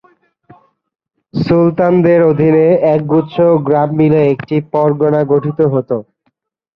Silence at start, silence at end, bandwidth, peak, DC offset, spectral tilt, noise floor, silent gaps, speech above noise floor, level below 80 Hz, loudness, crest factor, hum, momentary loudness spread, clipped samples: 1.35 s; 0.75 s; 5.8 kHz; 0 dBFS; under 0.1%; -11 dB/octave; -64 dBFS; none; 53 dB; -50 dBFS; -12 LUFS; 12 dB; none; 7 LU; under 0.1%